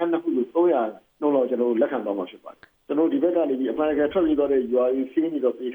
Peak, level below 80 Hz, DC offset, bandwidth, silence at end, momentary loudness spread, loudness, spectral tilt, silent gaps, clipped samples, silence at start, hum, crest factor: -8 dBFS; -60 dBFS; under 0.1%; over 20 kHz; 0 s; 6 LU; -23 LUFS; -8.5 dB/octave; none; under 0.1%; 0 s; none; 14 dB